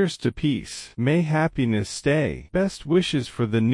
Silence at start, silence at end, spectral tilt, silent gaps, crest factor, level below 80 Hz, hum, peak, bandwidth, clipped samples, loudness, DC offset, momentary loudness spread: 0 s; 0 s; -6 dB/octave; none; 14 dB; -46 dBFS; none; -8 dBFS; 12 kHz; under 0.1%; -24 LUFS; under 0.1%; 4 LU